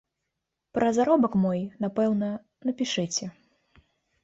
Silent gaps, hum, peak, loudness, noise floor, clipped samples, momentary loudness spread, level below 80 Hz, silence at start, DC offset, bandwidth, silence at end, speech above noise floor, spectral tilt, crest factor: none; none; -8 dBFS; -26 LUFS; -83 dBFS; under 0.1%; 11 LU; -64 dBFS; 0.75 s; under 0.1%; 8 kHz; 0.95 s; 58 dB; -5 dB/octave; 18 dB